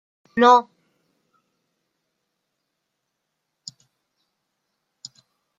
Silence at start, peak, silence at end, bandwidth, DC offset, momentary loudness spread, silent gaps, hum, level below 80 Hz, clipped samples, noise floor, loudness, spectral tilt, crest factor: 0.35 s; -4 dBFS; 4.95 s; 7.8 kHz; under 0.1%; 28 LU; none; none; -74 dBFS; under 0.1%; -79 dBFS; -17 LUFS; -3.5 dB/octave; 24 dB